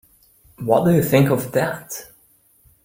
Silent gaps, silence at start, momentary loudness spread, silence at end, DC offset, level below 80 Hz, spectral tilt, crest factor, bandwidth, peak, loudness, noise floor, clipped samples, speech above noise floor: none; 0.6 s; 16 LU; 0.8 s; under 0.1%; -54 dBFS; -6.5 dB/octave; 18 dB; 16.5 kHz; -2 dBFS; -19 LUFS; -57 dBFS; under 0.1%; 39 dB